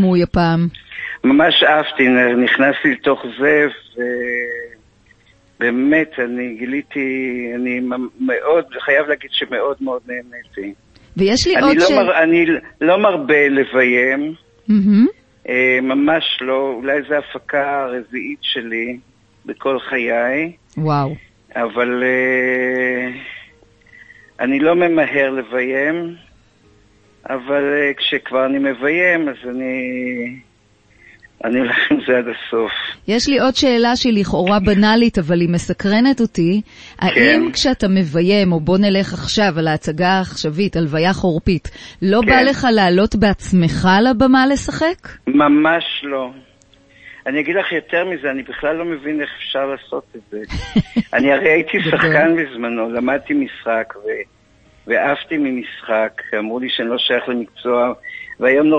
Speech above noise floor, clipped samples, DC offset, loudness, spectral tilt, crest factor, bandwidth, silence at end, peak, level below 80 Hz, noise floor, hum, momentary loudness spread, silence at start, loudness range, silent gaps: 38 dB; under 0.1%; under 0.1%; -16 LUFS; -5.5 dB/octave; 16 dB; 8.8 kHz; 0 s; 0 dBFS; -42 dBFS; -53 dBFS; none; 12 LU; 0 s; 7 LU; none